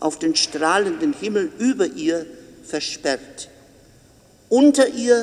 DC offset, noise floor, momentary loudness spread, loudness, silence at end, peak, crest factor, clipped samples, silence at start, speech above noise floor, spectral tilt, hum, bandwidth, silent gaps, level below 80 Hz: under 0.1%; -52 dBFS; 15 LU; -20 LUFS; 0 s; -4 dBFS; 18 dB; under 0.1%; 0 s; 32 dB; -3 dB/octave; none; 12.5 kHz; none; -60 dBFS